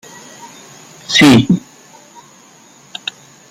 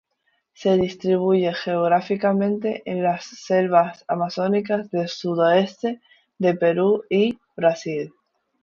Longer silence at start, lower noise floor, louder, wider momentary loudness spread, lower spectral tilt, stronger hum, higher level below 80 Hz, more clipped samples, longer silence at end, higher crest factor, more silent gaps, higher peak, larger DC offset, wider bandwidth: second, 0.45 s vs 0.6 s; second, -44 dBFS vs -70 dBFS; first, -11 LUFS vs -22 LUFS; first, 28 LU vs 8 LU; second, -4.5 dB/octave vs -6.5 dB/octave; neither; first, -50 dBFS vs -64 dBFS; neither; first, 1.9 s vs 0.55 s; about the same, 16 dB vs 18 dB; neither; first, 0 dBFS vs -4 dBFS; neither; first, 16 kHz vs 7.2 kHz